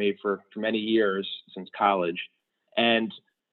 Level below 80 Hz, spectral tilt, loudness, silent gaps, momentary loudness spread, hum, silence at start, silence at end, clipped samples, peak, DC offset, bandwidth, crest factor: -74 dBFS; -8.5 dB/octave; -26 LUFS; none; 14 LU; none; 0 s; 0.35 s; under 0.1%; -8 dBFS; under 0.1%; 4.4 kHz; 20 dB